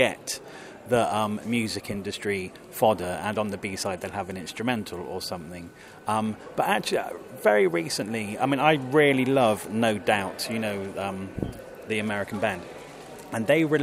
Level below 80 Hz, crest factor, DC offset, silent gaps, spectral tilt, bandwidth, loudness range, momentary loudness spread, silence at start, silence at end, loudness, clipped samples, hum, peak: -56 dBFS; 22 dB; under 0.1%; none; -4.5 dB/octave; 16 kHz; 7 LU; 15 LU; 0 s; 0 s; -26 LUFS; under 0.1%; none; -4 dBFS